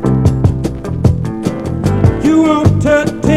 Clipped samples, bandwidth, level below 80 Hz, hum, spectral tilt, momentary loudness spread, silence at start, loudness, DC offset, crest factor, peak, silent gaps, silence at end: 0.3%; 12.5 kHz; -26 dBFS; none; -7.5 dB/octave; 8 LU; 0 s; -13 LUFS; under 0.1%; 12 dB; 0 dBFS; none; 0 s